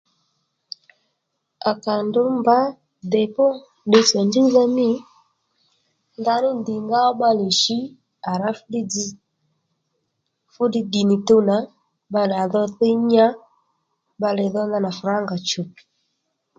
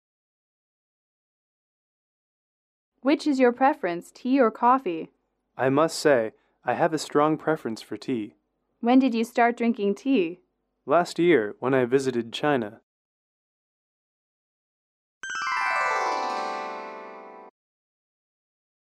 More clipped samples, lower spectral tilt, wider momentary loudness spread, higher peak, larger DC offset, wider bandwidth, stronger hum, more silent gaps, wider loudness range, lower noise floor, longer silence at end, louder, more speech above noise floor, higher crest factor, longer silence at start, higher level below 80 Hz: neither; about the same, -4.5 dB/octave vs -5.5 dB/octave; about the same, 12 LU vs 14 LU; first, -2 dBFS vs -8 dBFS; neither; second, 9 kHz vs 13.5 kHz; neither; second, none vs 12.83-15.21 s; about the same, 5 LU vs 7 LU; first, -75 dBFS vs -43 dBFS; second, 0.9 s vs 1.35 s; first, -20 LUFS vs -24 LUFS; first, 57 dB vs 20 dB; about the same, 20 dB vs 18 dB; second, 1.65 s vs 3.05 s; first, -68 dBFS vs -76 dBFS